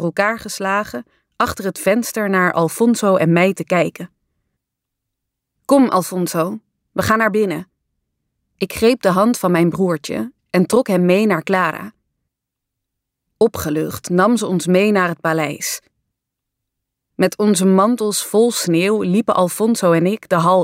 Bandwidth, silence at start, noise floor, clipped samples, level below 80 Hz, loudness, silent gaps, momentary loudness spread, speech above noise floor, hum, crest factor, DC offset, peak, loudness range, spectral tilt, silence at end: 16 kHz; 0 s; -80 dBFS; under 0.1%; -54 dBFS; -17 LUFS; none; 10 LU; 64 dB; none; 14 dB; under 0.1%; -2 dBFS; 4 LU; -5.5 dB/octave; 0 s